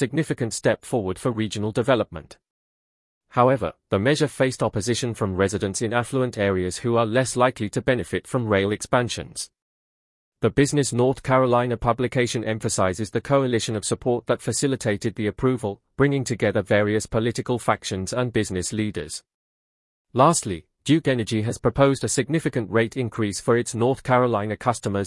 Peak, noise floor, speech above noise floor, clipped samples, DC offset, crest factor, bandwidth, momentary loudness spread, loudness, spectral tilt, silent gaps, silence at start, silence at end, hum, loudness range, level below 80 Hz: -4 dBFS; under -90 dBFS; over 68 dB; under 0.1%; under 0.1%; 20 dB; 12 kHz; 6 LU; -23 LUFS; -5 dB/octave; 2.50-3.21 s, 9.62-10.32 s, 19.34-20.05 s; 0 s; 0 s; none; 3 LU; -50 dBFS